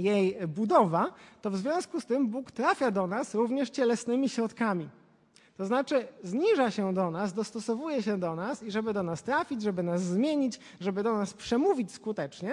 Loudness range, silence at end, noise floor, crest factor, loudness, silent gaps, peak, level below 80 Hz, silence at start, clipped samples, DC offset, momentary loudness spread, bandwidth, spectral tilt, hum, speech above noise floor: 2 LU; 0 s; -62 dBFS; 18 dB; -30 LUFS; none; -10 dBFS; -72 dBFS; 0 s; under 0.1%; under 0.1%; 8 LU; 11.5 kHz; -6 dB/octave; none; 33 dB